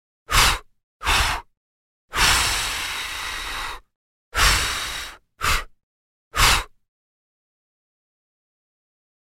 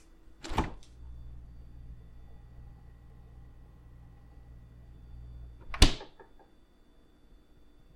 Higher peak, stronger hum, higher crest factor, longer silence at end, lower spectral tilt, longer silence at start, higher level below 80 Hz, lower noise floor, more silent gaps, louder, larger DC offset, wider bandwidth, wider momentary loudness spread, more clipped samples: first, -2 dBFS vs -6 dBFS; neither; second, 22 dB vs 30 dB; first, 2.55 s vs 0.3 s; second, -1 dB/octave vs -4 dB/octave; first, 0.3 s vs 0.1 s; first, -32 dBFS vs -40 dBFS; first, under -90 dBFS vs -60 dBFS; first, 0.83-1.00 s, 1.57-2.08 s, 3.95-4.32 s, 5.83-6.31 s vs none; first, -21 LUFS vs -31 LUFS; neither; about the same, 16.5 kHz vs 16 kHz; second, 13 LU vs 29 LU; neither